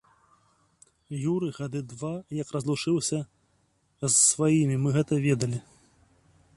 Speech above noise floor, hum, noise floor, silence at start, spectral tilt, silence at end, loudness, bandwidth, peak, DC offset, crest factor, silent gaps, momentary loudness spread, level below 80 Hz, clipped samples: 43 dB; none; -69 dBFS; 1.1 s; -4.5 dB/octave; 0.95 s; -26 LUFS; 11.5 kHz; -8 dBFS; under 0.1%; 20 dB; none; 15 LU; -64 dBFS; under 0.1%